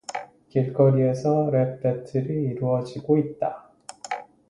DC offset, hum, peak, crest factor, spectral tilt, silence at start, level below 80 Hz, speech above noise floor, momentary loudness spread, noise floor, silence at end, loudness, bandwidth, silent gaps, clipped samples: under 0.1%; none; -6 dBFS; 18 dB; -8 dB/octave; 0.1 s; -62 dBFS; 21 dB; 15 LU; -44 dBFS; 0.25 s; -24 LUFS; 11 kHz; none; under 0.1%